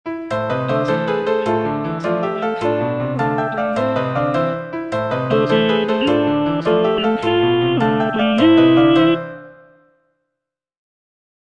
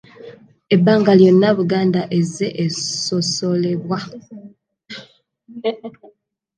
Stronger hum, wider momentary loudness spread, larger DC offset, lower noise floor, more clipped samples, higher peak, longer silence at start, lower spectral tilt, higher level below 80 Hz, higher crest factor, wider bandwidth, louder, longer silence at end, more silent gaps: neither; second, 9 LU vs 24 LU; neither; first, -81 dBFS vs -55 dBFS; neither; about the same, -2 dBFS vs 0 dBFS; second, 0.05 s vs 0.2 s; first, -7.5 dB/octave vs -5.5 dB/octave; first, -52 dBFS vs -64 dBFS; about the same, 16 dB vs 18 dB; second, 8.8 kHz vs 9.8 kHz; about the same, -17 LUFS vs -17 LUFS; first, 2 s vs 0.65 s; neither